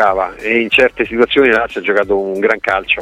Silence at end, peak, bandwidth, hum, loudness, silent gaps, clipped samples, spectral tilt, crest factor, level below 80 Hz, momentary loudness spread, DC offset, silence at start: 0 s; 0 dBFS; 10.5 kHz; none; -13 LUFS; none; under 0.1%; -5 dB/octave; 14 dB; -42 dBFS; 5 LU; under 0.1%; 0 s